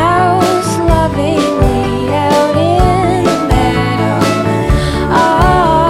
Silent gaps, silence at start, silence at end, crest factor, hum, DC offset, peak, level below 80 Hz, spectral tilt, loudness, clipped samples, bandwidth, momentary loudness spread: none; 0 s; 0 s; 10 dB; none; under 0.1%; 0 dBFS; -20 dBFS; -6 dB/octave; -11 LUFS; under 0.1%; 16 kHz; 4 LU